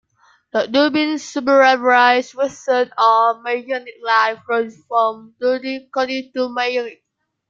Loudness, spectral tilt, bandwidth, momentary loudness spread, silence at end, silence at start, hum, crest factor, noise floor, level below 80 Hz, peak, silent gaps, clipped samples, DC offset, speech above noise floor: -17 LUFS; -3 dB/octave; 7.6 kHz; 11 LU; 0.55 s; 0.55 s; none; 18 dB; -57 dBFS; -68 dBFS; 0 dBFS; none; under 0.1%; under 0.1%; 39 dB